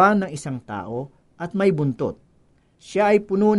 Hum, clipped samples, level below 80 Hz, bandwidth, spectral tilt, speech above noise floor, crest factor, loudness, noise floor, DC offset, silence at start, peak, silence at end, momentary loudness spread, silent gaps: none; under 0.1%; -58 dBFS; 11.5 kHz; -7 dB/octave; 38 dB; 18 dB; -23 LUFS; -59 dBFS; under 0.1%; 0 s; -4 dBFS; 0 s; 15 LU; none